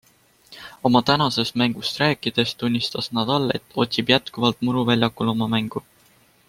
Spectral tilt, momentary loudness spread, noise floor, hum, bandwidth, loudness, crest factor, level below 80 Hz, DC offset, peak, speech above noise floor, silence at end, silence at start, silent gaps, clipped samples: -5.5 dB/octave; 6 LU; -57 dBFS; none; 16 kHz; -21 LUFS; 20 dB; -56 dBFS; under 0.1%; -2 dBFS; 35 dB; 0.7 s; 0.5 s; none; under 0.1%